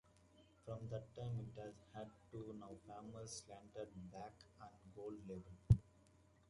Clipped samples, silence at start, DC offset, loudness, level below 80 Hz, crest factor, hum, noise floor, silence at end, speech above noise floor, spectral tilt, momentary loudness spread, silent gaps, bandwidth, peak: under 0.1%; 0.35 s; under 0.1%; -48 LUFS; -60 dBFS; 28 dB; none; -71 dBFS; 0.6 s; 19 dB; -7 dB/octave; 20 LU; none; 11 kHz; -20 dBFS